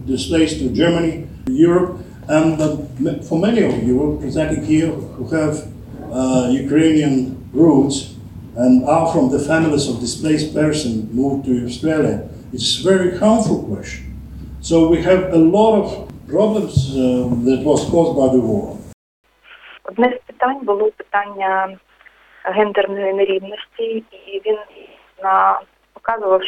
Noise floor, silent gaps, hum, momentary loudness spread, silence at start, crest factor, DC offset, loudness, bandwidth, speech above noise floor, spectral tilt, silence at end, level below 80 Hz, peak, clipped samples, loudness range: -49 dBFS; 18.94-19.24 s; none; 14 LU; 0 s; 16 dB; under 0.1%; -17 LUFS; 12 kHz; 33 dB; -6 dB/octave; 0 s; -40 dBFS; 0 dBFS; under 0.1%; 5 LU